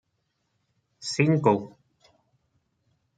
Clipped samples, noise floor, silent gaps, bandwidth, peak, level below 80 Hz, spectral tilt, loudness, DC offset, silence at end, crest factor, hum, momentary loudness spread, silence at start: under 0.1%; -76 dBFS; none; 9.2 kHz; -6 dBFS; -70 dBFS; -6 dB/octave; -24 LUFS; under 0.1%; 1.5 s; 22 dB; none; 17 LU; 1 s